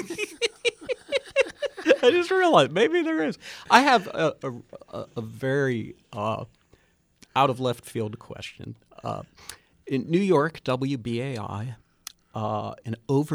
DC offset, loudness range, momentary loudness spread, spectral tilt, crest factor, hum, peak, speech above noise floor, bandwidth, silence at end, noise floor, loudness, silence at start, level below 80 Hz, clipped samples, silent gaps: under 0.1%; 9 LU; 19 LU; -5 dB/octave; 24 dB; none; -2 dBFS; 37 dB; 19 kHz; 0 s; -62 dBFS; -25 LUFS; 0 s; -64 dBFS; under 0.1%; none